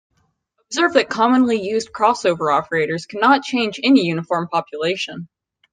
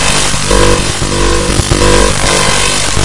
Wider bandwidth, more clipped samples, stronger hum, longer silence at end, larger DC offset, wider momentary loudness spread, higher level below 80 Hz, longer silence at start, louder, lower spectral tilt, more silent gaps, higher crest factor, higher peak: second, 9.6 kHz vs 12 kHz; second, under 0.1% vs 0.6%; neither; first, 0.45 s vs 0 s; neither; first, 8 LU vs 3 LU; second, -62 dBFS vs -18 dBFS; first, 0.7 s vs 0 s; second, -18 LUFS vs -9 LUFS; first, -4.5 dB/octave vs -3 dB/octave; neither; first, 18 dB vs 10 dB; about the same, -2 dBFS vs 0 dBFS